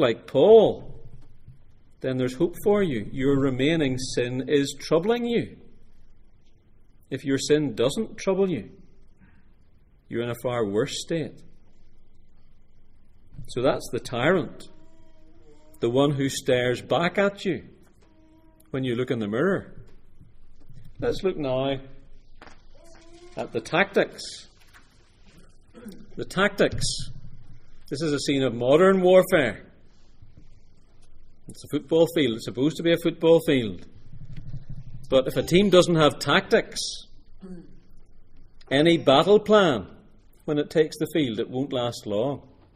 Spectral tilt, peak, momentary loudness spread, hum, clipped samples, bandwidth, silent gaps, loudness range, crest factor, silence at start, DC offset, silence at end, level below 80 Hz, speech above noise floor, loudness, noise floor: -5.5 dB/octave; -2 dBFS; 19 LU; none; under 0.1%; 15.5 kHz; none; 9 LU; 22 dB; 0 s; under 0.1%; 0.35 s; -46 dBFS; 31 dB; -23 LUFS; -54 dBFS